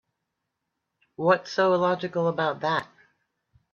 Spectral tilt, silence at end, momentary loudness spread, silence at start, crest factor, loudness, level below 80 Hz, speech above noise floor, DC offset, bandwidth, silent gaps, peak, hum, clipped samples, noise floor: -6 dB/octave; 0.9 s; 6 LU; 1.2 s; 20 dB; -25 LUFS; -72 dBFS; 58 dB; under 0.1%; 7 kHz; none; -6 dBFS; none; under 0.1%; -82 dBFS